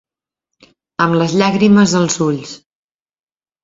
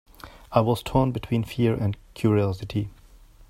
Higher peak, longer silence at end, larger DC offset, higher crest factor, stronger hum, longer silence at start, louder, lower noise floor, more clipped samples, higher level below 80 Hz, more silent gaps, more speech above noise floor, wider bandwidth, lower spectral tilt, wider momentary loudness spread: about the same, 0 dBFS vs -2 dBFS; first, 1.05 s vs 0.35 s; neither; second, 16 dB vs 22 dB; neither; first, 1 s vs 0.25 s; first, -13 LUFS vs -25 LUFS; first, -80 dBFS vs -50 dBFS; neither; second, -54 dBFS vs -46 dBFS; neither; first, 67 dB vs 27 dB; second, 7.8 kHz vs 16 kHz; second, -5 dB/octave vs -8 dB/octave; first, 15 LU vs 7 LU